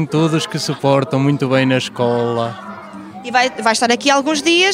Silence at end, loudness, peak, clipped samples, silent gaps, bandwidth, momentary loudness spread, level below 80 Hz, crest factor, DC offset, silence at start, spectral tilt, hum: 0 s; -16 LUFS; 0 dBFS; under 0.1%; none; 16 kHz; 15 LU; -62 dBFS; 16 dB; under 0.1%; 0 s; -4.5 dB/octave; none